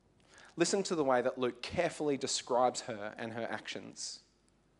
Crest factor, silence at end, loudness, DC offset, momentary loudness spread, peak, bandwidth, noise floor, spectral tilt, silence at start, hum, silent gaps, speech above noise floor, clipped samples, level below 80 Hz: 20 dB; 0.6 s; -34 LUFS; under 0.1%; 12 LU; -16 dBFS; 11 kHz; -70 dBFS; -3.5 dB/octave; 0.35 s; none; none; 36 dB; under 0.1%; -72 dBFS